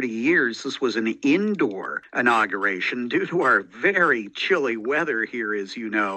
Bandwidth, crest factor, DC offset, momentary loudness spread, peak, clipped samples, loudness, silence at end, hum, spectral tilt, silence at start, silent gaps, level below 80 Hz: 8.8 kHz; 18 dB; under 0.1%; 7 LU; -6 dBFS; under 0.1%; -22 LUFS; 0 s; none; -5 dB/octave; 0 s; none; -72 dBFS